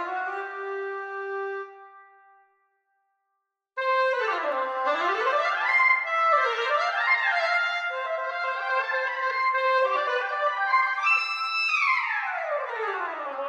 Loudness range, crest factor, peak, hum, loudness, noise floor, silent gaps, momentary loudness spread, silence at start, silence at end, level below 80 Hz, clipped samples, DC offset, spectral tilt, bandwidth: 10 LU; 16 dB; -10 dBFS; none; -25 LUFS; -80 dBFS; none; 11 LU; 0 s; 0 s; under -90 dBFS; under 0.1%; under 0.1%; 1.5 dB/octave; 9.8 kHz